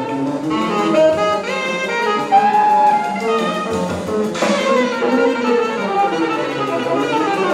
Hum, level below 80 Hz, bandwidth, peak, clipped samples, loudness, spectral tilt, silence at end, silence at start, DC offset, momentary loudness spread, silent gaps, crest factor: none; -56 dBFS; 14.5 kHz; -4 dBFS; under 0.1%; -16 LUFS; -5 dB/octave; 0 s; 0 s; under 0.1%; 7 LU; none; 14 dB